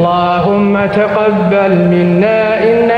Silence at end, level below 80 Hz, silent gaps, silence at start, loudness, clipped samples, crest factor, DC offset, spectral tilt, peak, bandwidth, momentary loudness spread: 0 s; -44 dBFS; none; 0 s; -11 LUFS; under 0.1%; 10 dB; under 0.1%; -9 dB/octave; 0 dBFS; 5.6 kHz; 1 LU